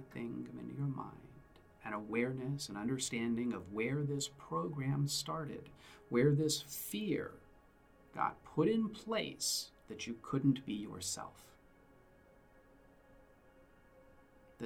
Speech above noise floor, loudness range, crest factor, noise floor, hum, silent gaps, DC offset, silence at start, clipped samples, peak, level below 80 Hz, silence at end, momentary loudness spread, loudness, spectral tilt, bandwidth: 27 dB; 5 LU; 20 dB; -65 dBFS; none; none; under 0.1%; 0 s; under 0.1%; -20 dBFS; -68 dBFS; 0 s; 13 LU; -38 LUFS; -5 dB/octave; 17.5 kHz